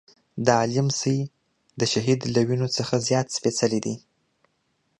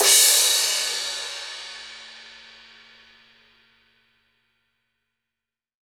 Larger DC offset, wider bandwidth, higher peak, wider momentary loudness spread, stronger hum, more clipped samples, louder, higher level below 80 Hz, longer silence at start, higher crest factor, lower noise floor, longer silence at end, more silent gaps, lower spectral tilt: neither; second, 11 kHz vs over 20 kHz; about the same, -4 dBFS vs -4 dBFS; second, 8 LU vs 28 LU; neither; neither; second, -24 LUFS vs -18 LUFS; first, -62 dBFS vs -72 dBFS; first, 0.35 s vs 0 s; about the same, 22 dB vs 22 dB; second, -71 dBFS vs -88 dBFS; second, 1 s vs 3.6 s; neither; first, -5 dB/octave vs 4 dB/octave